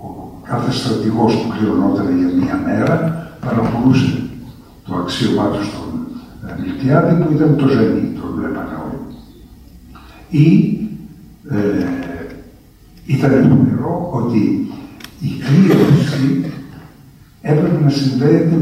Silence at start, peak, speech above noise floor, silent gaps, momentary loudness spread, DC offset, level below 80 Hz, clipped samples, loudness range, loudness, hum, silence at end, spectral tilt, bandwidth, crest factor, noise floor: 0 s; 0 dBFS; 29 dB; none; 17 LU; under 0.1%; -42 dBFS; under 0.1%; 4 LU; -16 LUFS; none; 0 s; -8 dB/octave; 14.5 kHz; 16 dB; -43 dBFS